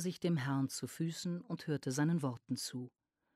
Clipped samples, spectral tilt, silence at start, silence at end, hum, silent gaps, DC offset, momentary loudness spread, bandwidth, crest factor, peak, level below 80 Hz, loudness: under 0.1%; -5.5 dB/octave; 0 s; 0.5 s; none; none; under 0.1%; 8 LU; 15 kHz; 14 dB; -24 dBFS; -80 dBFS; -38 LUFS